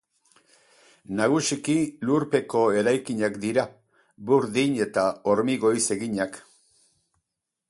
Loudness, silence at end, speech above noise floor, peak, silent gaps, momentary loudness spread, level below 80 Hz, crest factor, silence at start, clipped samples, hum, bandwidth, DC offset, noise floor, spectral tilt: -24 LUFS; 1.3 s; 60 dB; -8 dBFS; none; 7 LU; -66 dBFS; 18 dB; 1.1 s; under 0.1%; none; 11.5 kHz; under 0.1%; -83 dBFS; -4.5 dB/octave